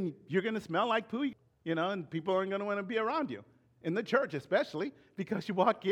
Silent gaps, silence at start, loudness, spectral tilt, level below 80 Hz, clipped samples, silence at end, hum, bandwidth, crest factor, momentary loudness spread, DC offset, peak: none; 0 s; -34 LUFS; -6.5 dB/octave; -78 dBFS; under 0.1%; 0 s; none; 13 kHz; 20 dB; 9 LU; under 0.1%; -14 dBFS